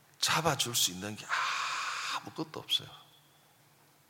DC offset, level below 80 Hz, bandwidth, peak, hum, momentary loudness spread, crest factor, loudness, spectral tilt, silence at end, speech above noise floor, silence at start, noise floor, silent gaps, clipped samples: under 0.1%; -70 dBFS; 17 kHz; -14 dBFS; none; 13 LU; 22 dB; -32 LUFS; -1.5 dB/octave; 1.05 s; 31 dB; 0.2 s; -64 dBFS; none; under 0.1%